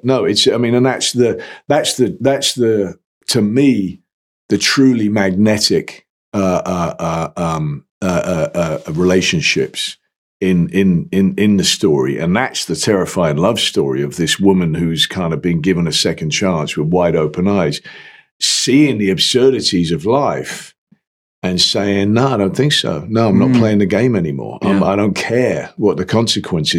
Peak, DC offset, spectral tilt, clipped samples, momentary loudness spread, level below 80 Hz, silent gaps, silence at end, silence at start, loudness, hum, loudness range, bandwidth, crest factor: -2 dBFS; under 0.1%; -4.5 dB/octave; under 0.1%; 8 LU; -46 dBFS; 3.05-3.21 s, 4.13-4.49 s, 6.10-6.32 s, 7.90-8.01 s, 10.16-10.40 s, 18.31-18.40 s, 20.78-20.87 s, 21.07-21.42 s; 0 s; 0.05 s; -15 LUFS; none; 3 LU; 16 kHz; 14 dB